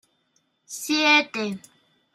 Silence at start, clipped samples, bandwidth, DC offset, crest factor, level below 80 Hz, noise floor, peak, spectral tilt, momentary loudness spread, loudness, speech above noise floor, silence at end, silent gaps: 0.7 s; under 0.1%; 15.5 kHz; under 0.1%; 20 dB; -78 dBFS; -69 dBFS; -6 dBFS; -2 dB/octave; 21 LU; -21 LUFS; 47 dB; 0.55 s; none